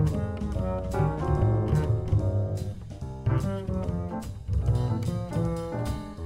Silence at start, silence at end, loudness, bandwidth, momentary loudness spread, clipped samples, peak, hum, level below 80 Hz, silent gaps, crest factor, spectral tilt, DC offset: 0 s; 0 s; -29 LUFS; 12 kHz; 8 LU; under 0.1%; -12 dBFS; none; -36 dBFS; none; 16 dB; -8.5 dB/octave; under 0.1%